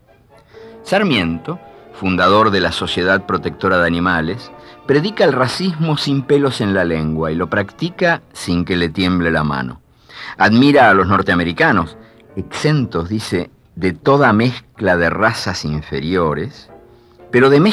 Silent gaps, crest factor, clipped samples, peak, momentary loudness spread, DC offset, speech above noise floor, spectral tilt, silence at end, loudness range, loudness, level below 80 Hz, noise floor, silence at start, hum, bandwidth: none; 14 dB; under 0.1%; -2 dBFS; 13 LU; under 0.1%; 33 dB; -6 dB/octave; 0 s; 3 LU; -15 LUFS; -42 dBFS; -48 dBFS; 0.55 s; none; 13 kHz